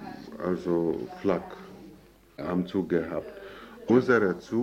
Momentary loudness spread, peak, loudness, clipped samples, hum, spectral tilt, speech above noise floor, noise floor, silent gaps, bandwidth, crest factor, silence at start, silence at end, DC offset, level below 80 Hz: 20 LU; -10 dBFS; -28 LUFS; under 0.1%; none; -8 dB/octave; 26 dB; -53 dBFS; none; 15.5 kHz; 20 dB; 0 s; 0 s; under 0.1%; -60 dBFS